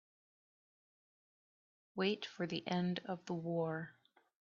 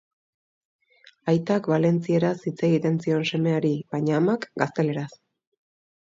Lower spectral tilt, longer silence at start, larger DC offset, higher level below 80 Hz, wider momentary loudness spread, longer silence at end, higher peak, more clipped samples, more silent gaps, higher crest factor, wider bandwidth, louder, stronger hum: second, -4.5 dB/octave vs -7.5 dB/octave; first, 1.95 s vs 1.25 s; neither; second, -84 dBFS vs -68 dBFS; about the same, 7 LU vs 5 LU; second, 0.55 s vs 0.95 s; second, -22 dBFS vs -4 dBFS; neither; neither; about the same, 22 dB vs 22 dB; about the same, 7.2 kHz vs 7.6 kHz; second, -40 LUFS vs -24 LUFS; neither